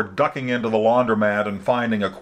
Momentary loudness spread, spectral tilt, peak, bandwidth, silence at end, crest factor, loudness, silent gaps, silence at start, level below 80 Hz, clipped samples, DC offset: 5 LU; -7 dB/octave; -6 dBFS; 9.6 kHz; 0 s; 16 dB; -20 LUFS; none; 0 s; -58 dBFS; under 0.1%; under 0.1%